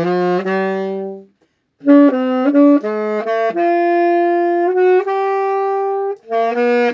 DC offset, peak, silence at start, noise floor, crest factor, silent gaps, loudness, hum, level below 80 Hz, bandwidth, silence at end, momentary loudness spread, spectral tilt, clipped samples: under 0.1%; 0 dBFS; 0 s; -61 dBFS; 14 dB; none; -15 LUFS; none; -78 dBFS; 7.2 kHz; 0 s; 9 LU; -8 dB/octave; under 0.1%